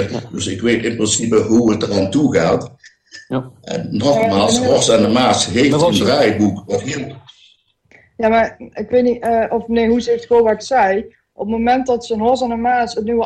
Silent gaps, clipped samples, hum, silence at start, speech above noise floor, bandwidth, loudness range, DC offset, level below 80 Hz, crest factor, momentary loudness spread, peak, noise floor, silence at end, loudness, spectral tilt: none; under 0.1%; none; 0 s; 38 dB; 12.5 kHz; 4 LU; under 0.1%; -46 dBFS; 14 dB; 11 LU; -2 dBFS; -53 dBFS; 0 s; -16 LUFS; -4.5 dB/octave